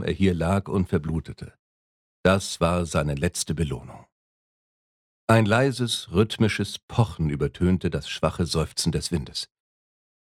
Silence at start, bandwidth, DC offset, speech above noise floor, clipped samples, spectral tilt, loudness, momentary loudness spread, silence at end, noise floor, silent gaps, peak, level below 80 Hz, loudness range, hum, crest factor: 0 s; 15.5 kHz; under 0.1%; over 66 dB; under 0.1%; -5.5 dB/octave; -25 LUFS; 10 LU; 0.95 s; under -90 dBFS; 1.59-2.24 s, 4.12-5.28 s, 6.83-6.88 s; -4 dBFS; -42 dBFS; 3 LU; none; 22 dB